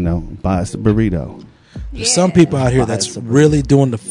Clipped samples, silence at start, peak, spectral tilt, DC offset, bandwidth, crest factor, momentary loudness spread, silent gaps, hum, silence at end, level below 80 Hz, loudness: 0.2%; 0 s; 0 dBFS; -5.5 dB/octave; under 0.1%; 11 kHz; 14 dB; 10 LU; none; none; 0 s; -32 dBFS; -15 LUFS